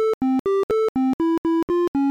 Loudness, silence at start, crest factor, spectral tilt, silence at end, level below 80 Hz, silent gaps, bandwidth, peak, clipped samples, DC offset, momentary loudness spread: -21 LUFS; 0 s; 4 dB; -7 dB/octave; 0 s; -54 dBFS; 0.14-0.21 s, 0.39-0.45 s, 0.63-0.69 s, 0.89-0.95 s, 1.14-1.19 s, 1.38-1.44 s, 1.63-1.68 s, 1.88-1.94 s; 9.8 kHz; -18 dBFS; under 0.1%; under 0.1%; 1 LU